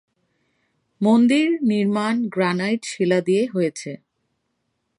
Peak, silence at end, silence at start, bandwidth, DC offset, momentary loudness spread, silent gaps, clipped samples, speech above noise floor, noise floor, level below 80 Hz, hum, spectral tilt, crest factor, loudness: -6 dBFS; 1 s; 1 s; 11 kHz; under 0.1%; 9 LU; none; under 0.1%; 54 dB; -74 dBFS; -70 dBFS; none; -6 dB/octave; 16 dB; -20 LUFS